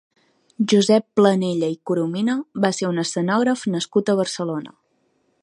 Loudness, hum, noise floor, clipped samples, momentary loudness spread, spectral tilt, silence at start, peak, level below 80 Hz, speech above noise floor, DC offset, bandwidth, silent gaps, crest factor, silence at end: -20 LUFS; none; -66 dBFS; under 0.1%; 8 LU; -5.5 dB/octave; 0.6 s; -2 dBFS; -70 dBFS; 46 dB; under 0.1%; 11 kHz; none; 18 dB; 0.75 s